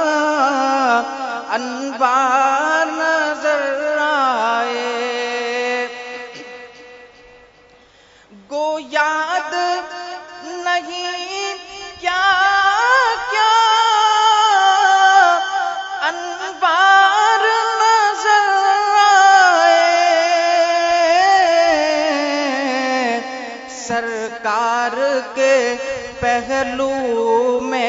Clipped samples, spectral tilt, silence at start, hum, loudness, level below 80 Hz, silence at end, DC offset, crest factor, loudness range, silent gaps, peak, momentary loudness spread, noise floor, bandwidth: under 0.1%; -1.5 dB/octave; 0 s; none; -15 LUFS; -56 dBFS; 0 s; under 0.1%; 16 dB; 10 LU; none; 0 dBFS; 13 LU; -49 dBFS; 7.8 kHz